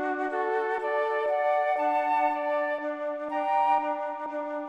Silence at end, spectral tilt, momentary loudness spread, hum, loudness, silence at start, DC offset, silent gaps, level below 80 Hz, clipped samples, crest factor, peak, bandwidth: 0 s; -3.5 dB/octave; 7 LU; none; -27 LUFS; 0 s; under 0.1%; none; -80 dBFS; under 0.1%; 14 dB; -14 dBFS; 8.6 kHz